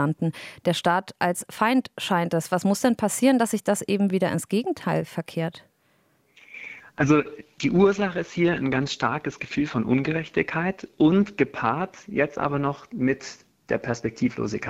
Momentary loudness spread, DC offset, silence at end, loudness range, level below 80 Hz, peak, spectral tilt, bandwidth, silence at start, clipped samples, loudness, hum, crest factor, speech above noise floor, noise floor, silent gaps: 9 LU; under 0.1%; 0 s; 4 LU; -58 dBFS; -6 dBFS; -5.5 dB/octave; 16 kHz; 0 s; under 0.1%; -24 LUFS; none; 18 dB; 41 dB; -65 dBFS; none